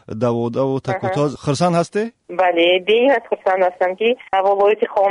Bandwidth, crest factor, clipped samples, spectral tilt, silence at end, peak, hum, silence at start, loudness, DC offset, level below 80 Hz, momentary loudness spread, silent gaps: 10.5 kHz; 12 dB; under 0.1%; -5.5 dB/octave; 0 s; -4 dBFS; none; 0.1 s; -17 LUFS; under 0.1%; -58 dBFS; 6 LU; none